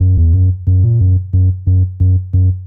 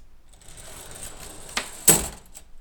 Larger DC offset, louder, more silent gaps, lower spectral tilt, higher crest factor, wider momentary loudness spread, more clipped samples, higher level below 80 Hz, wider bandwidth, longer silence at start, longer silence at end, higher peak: neither; first, -13 LUFS vs -20 LUFS; neither; first, -15.5 dB/octave vs -1.5 dB/octave; second, 6 dB vs 28 dB; second, 3 LU vs 25 LU; neither; first, -22 dBFS vs -44 dBFS; second, 0.9 kHz vs over 20 kHz; about the same, 0 s vs 0 s; about the same, 0 s vs 0 s; second, -4 dBFS vs 0 dBFS